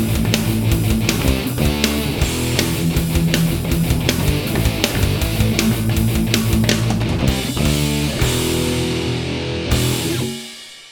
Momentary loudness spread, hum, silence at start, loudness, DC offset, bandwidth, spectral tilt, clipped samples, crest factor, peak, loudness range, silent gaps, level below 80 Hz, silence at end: 4 LU; none; 0 s; -18 LUFS; under 0.1%; over 20 kHz; -5 dB/octave; under 0.1%; 18 dB; 0 dBFS; 1 LU; none; -26 dBFS; 0 s